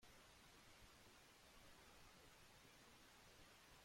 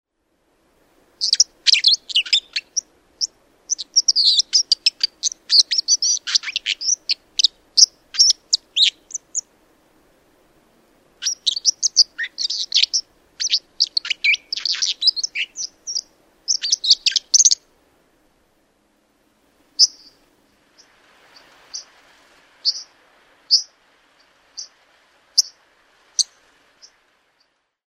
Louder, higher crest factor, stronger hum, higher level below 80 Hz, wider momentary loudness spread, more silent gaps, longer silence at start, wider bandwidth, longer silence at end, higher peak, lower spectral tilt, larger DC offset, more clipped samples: second, -67 LUFS vs -17 LUFS; second, 14 dB vs 22 dB; neither; second, -78 dBFS vs -68 dBFS; second, 1 LU vs 14 LU; neither; second, 0 s vs 1.2 s; about the same, 16.5 kHz vs 16 kHz; second, 0 s vs 1.65 s; second, -54 dBFS vs 0 dBFS; first, -2.5 dB/octave vs 5.5 dB/octave; neither; neither